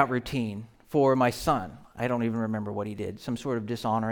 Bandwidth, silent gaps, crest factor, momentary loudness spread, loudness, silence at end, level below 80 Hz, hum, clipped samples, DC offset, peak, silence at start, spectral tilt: over 20 kHz; none; 22 dB; 11 LU; -28 LUFS; 0 s; -54 dBFS; none; under 0.1%; under 0.1%; -6 dBFS; 0 s; -6.5 dB/octave